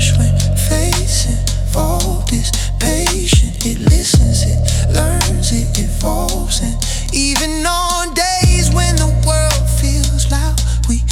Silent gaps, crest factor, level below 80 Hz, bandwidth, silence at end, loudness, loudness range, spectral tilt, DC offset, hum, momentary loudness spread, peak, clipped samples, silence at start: none; 14 dB; -16 dBFS; 17 kHz; 0 s; -15 LUFS; 2 LU; -4 dB/octave; under 0.1%; none; 5 LU; 0 dBFS; under 0.1%; 0 s